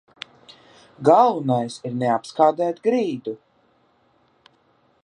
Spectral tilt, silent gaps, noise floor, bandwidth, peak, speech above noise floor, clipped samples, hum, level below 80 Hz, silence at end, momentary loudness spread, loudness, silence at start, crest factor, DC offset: -6.5 dB/octave; none; -62 dBFS; 11 kHz; -2 dBFS; 42 dB; under 0.1%; none; -70 dBFS; 1.7 s; 23 LU; -20 LUFS; 1 s; 20 dB; under 0.1%